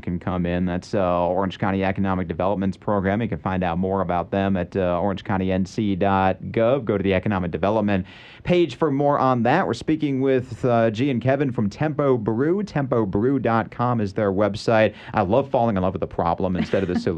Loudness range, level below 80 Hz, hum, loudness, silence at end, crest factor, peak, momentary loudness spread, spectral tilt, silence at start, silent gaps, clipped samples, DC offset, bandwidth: 2 LU; -48 dBFS; none; -22 LUFS; 0 s; 16 dB; -6 dBFS; 5 LU; -8 dB/octave; 0.05 s; none; under 0.1%; under 0.1%; 9 kHz